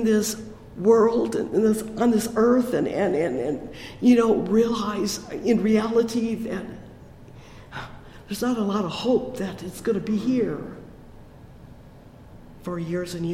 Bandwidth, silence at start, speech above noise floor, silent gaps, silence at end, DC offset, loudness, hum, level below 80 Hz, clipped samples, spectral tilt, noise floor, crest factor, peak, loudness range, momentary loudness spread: 16 kHz; 0 s; 24 dB; none; 0 s; under 0.1%; -23 LUFS; none; -50 dBFS; under 0.1%; -5.5 dB/octave; -46 dBFS; 16 dB; -6 dBFS; 8 LU; 19 LU